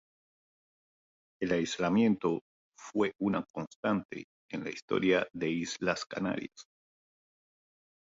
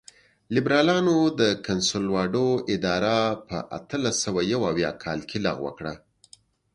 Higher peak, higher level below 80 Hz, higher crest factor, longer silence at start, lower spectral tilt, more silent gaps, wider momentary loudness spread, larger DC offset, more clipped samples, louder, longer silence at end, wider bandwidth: second, -14 dBFS vs -6 dBFS; second, -68 dBFS vs -54 dBFS; about the same, 20 dB vs 18 dB; first, 1.4 s vs 0.5 s; about the same, -5.5 dB/octave vs -4.5 dB/octave; first, 2.41-2.72 s, 3.50-3.54 s, 3.67-3.83 s, 4.05-4.09 s, 4.24-4.49 s, 4.82-4.88 s vs none; about the same, 13 LU vs 12 LU; neither; neither; second, -32 LUFS vs -24 LUFS; first, 1.55 s vs 0.8 s; second, 7.8 kHz vs 11 kHz